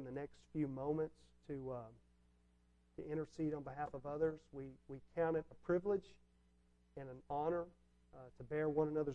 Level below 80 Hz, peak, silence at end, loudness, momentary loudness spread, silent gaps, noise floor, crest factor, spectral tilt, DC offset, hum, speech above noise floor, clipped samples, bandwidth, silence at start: -68 dBFS; -24 dBFS; 0 s; -43 LUFS; 16 LU; none; -73 dBFS; 20 dB; -9 dB/octave; under 0.1%; 60 Hz at -70 dBFS; 31 dB; under 0.1%; 8.4 kHz; 0 s